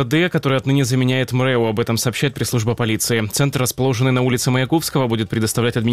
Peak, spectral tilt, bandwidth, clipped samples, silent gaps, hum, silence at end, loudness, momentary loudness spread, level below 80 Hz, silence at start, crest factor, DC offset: -6 dBFS; -5 dB/octave; 16 kHz; under 0.1%; none; none; 0 s; -18 LUFS; 3 LU; -48 dBFS; 0 s; 12 dB; 0.3%